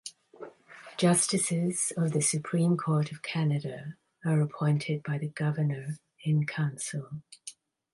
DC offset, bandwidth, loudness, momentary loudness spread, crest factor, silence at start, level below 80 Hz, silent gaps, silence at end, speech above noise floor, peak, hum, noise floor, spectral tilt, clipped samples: under 0.1%; 11.5 kHz; -29 LUFS; 19 LU; 18 dB; 0.05 s; -74 dBFS; none; 0.4 s; 22 dB; -12 dBFS; none; -51 dBFS; -5 dB/octave; under 0.1%